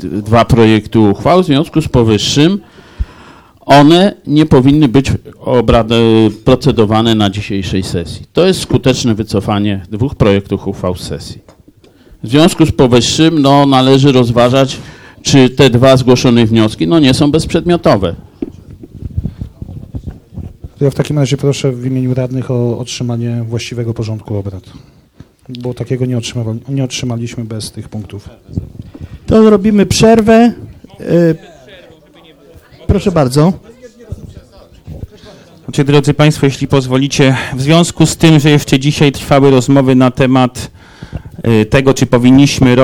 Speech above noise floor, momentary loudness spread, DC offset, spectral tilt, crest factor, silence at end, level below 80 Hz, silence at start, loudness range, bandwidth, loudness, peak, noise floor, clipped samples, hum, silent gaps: 33 dB; 19 LU; under 0.1%; -6 dB/octave; 10 dB; 0 s; -32 dBFS; 0 s; 10 LU; 16 kHz; -10 LUFS; 0 dBFS; -43 dBFS; 0.8%; none; none